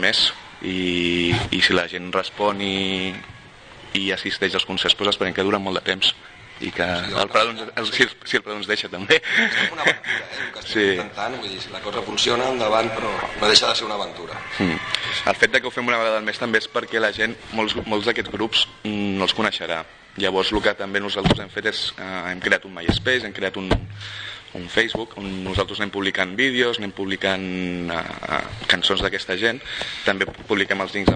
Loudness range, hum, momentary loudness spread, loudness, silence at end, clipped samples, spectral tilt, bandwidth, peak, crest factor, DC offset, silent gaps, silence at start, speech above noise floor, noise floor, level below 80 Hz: 3 LU; none; 10 LU; -21 LUFS; 0 s; under 0.1%; -3.5 dB/octave; 9.8 kHz; 0 dBFS; 22 dB; under 0.1%; none; 0 s; 21 dB; -43 dBFS; -44 dBFS